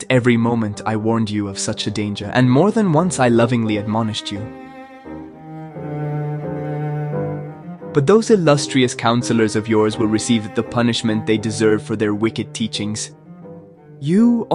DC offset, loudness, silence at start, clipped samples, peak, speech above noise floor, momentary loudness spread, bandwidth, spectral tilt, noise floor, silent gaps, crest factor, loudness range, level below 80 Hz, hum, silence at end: under 0.1%; -18 LUFS; 0 s; under 0.1%; -2 dBFS; 23 dB; 18 LU; 11.5 kHz; -5.5 dB/octave; -40 dBFS; none; 16 dB; 9 LU; -54 dBFS; none; 0 s